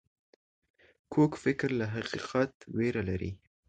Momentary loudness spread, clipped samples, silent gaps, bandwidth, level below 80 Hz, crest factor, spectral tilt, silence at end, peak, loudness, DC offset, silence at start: 8 LU; under 0.1%; 2.54-2.60 s; 9.2 kHz; -54 dBFS; 18 dB; -7 dB/octave; 0.3 s; -14 dBFS; -32 LUFS; under 0.1%; 1.1 s